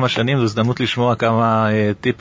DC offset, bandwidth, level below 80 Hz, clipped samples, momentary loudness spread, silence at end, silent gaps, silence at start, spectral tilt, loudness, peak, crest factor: under 0.1%; 7.6 kHz; -48 dBFS; under 0.1%; 3 LU; 0.05 s; none; 0 s; -6.5 dB/octave; -17 LUFS; -2 dBFS; 16 dB